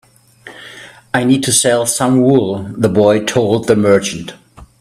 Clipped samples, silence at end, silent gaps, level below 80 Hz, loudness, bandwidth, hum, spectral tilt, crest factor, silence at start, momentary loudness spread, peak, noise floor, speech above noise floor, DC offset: under 0.1%; 0.15 s; none; -50 dBFS; -13 LUFS; 15 kHz; none; -4.5 dB/octave; 14 dB; 0.45 s; 21 LU; 0 dBFS; -39 dBFS; 27 dB; under 0.1%